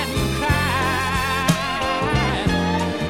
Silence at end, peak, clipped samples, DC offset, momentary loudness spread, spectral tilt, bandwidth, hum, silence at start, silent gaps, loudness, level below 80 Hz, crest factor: 0 s; -4 dBFS; under 0.1%; 0.4%; 2 LU; -5 dB/octave; 16.5 kHz; none; 0 s; none; -20 LUFS; -32 dBFS; 18 dB